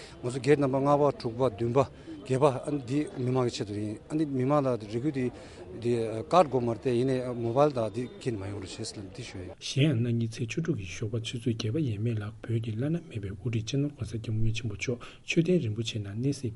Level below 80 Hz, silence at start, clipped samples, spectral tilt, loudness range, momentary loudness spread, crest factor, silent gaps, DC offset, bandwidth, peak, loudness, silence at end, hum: -50 dBFS; 0 s; under 0.1%; -6.5 dB/octave; 4 LU; 11 LU; 20 dB; none; under 0.1%; 11.5 kHz; -8 dBFS; -30 LUFS; 0 s; none